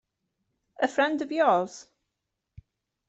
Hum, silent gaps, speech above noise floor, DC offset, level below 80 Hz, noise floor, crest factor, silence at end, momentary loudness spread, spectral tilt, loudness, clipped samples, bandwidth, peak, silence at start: none; none; 58 dB; under 0.1%; -68 dBFS; -84 dBFS; 20 dB; 1.25 s; 12 LU; -4.5 dB/octave; -26 LUFS; under 0.1%; 8.2 kHz; -10 dBFS; 0.8 s